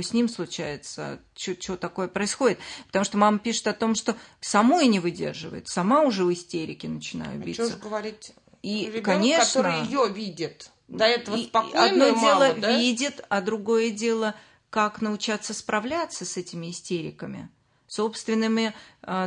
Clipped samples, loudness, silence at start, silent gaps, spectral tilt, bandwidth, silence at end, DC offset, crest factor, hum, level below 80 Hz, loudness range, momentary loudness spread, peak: under 0.1%; -25 LUFS; 0 s; none; -4 dB/octave; 10.5 kHz; 0 s; under 0.1%; 20 dB; none; -66 dBFS; 7 LU; 15 LU; -4 dBFS